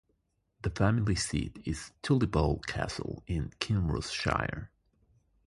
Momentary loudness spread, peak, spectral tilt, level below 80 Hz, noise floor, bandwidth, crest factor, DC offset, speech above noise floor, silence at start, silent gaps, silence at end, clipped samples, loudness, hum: 10 LU; -10 dBFS; -5.5 dB/octave; -44 dBFS; -76 dBFS; 11.5 kHz; 22 dB; under 0.1%; 45 dB; 0.65 s; none; 0.8 s; under 0.1%; -32 LUFS; none